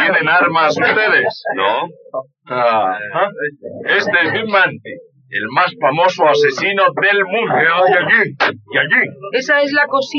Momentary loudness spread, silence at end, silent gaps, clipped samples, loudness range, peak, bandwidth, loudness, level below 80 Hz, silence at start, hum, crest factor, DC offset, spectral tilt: 13 LU; 0 s; none; under 0.1%; 4 LU; -2 dBFS; 7.2 kHz; -14 LUFS; -78 dBFS; 0 s; none; 14 dB; under 0.1%; -1 dB/octave